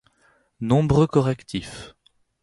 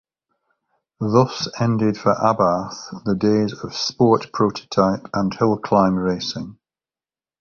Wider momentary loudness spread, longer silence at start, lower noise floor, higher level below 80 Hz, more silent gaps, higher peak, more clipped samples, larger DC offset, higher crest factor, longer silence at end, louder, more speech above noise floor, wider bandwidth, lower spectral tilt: first, 18 LU vs 8 LU; second, 0.6 s vs 1 s; second, -62 dBFS vs under -90 dBFS; first, -46 dBFS vs -52 dBFS; neither; second, -6 dBFS vs -2 dBFS; neither; neither; about the same, 18 dB vs 18 dB; second, 0.55 s vs 0.9 s; about the same, -22 LUFS vs -20 LUFS; second, 41 dB vs over 71 dB; first, 11.5 kHz vs 7.2 kHz; about the same, -7.5 dB/octave vs -6.5 dB/octave